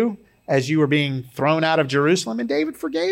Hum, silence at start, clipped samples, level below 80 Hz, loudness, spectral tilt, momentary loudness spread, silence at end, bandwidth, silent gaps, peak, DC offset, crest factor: none; 0 s; under 0.1%; -64 dBFS; -21 LUFS; -5.5 dB/octave; 7 LU; 0 s; 16.5 kHz; none; -6 dBFS; under 0.1%; 14 dB